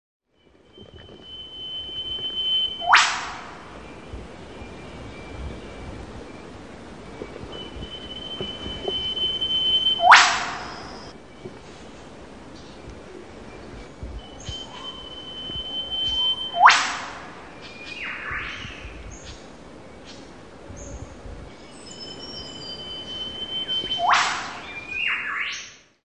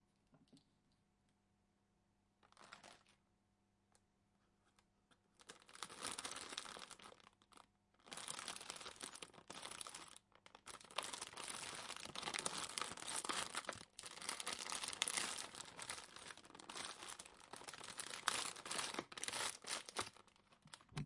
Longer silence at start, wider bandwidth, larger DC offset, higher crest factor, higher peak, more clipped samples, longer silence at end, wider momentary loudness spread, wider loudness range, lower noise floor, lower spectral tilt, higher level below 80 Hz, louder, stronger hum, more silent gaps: first, 0.7 s vs 0.3 s; second, 10.5 kHz vs 12 kHz; first, 0.3% vs under 0.1%; second, 26 dB vs 36 dB; first, 0 dBFS vs -16 dBFS; neither; first, 0.25 s vs 0 s; first, 24 LU vs 19 LU; second, 20 LU vs 23 LU; second, -58 dBFS vs -81 dBFS; about the same, -1.5 dB/octave vs -0.5 dB/octave; first, -46 dBFS vs -80 dBFS; first, -22 LUFS vs -47 LUFS; neither; neither